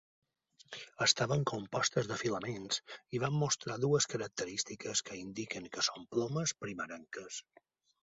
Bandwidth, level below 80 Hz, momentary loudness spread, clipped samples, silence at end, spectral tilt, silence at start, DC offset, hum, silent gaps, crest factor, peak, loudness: 8 kHz; -70 dBFS; 13 LU; under 0.1%; 0.7 s; -3.5 dB/octave; 0.7 s; under 0.1%; none; none; 26 dB; -12 dBFS; -35 LUFS